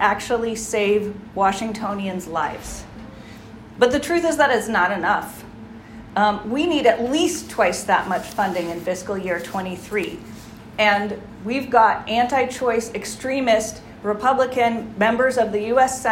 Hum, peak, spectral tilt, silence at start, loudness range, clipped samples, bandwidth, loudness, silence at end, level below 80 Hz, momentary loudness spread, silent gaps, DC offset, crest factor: none; -2 dBFS; -4 dB/octave; 0 s; 4 LU; under 0.1%; 16 kHz; -21 LUFS; 0 s; -50 dBFS; 18 LU; none; under 0.1%; 18 dB